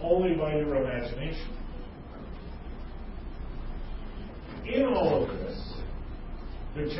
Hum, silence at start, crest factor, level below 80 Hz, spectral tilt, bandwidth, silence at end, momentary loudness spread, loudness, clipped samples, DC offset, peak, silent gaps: none; 0 s; 18 dB; -40 dBFS; -10.5 dB/octave; 5.8 kHz; 0 s; 18 LU; -31 LUFS; under 0.1%; under 0.1%; -12 dBFS; none